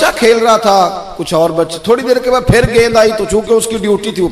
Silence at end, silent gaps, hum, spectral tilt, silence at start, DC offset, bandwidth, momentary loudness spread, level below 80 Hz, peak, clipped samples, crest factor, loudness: 0 s; none; none; -4.5 dB/octave; 0 s; under 0.1%; 14.5 kHz; 6 LU; -30 dBFS; 0 dBFS; under 0.1%; 10 dB; -11 LUFS